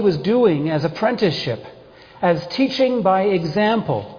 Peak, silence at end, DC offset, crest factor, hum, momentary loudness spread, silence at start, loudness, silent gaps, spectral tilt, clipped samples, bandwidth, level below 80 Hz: -4 dBFS; 0 s; under 0.1%; 14 dB; none; 6 LU; 0 s; -19 LUFS; none; -7 dB/octave; under 0.1%; 5.4 kHz; -56 dBFS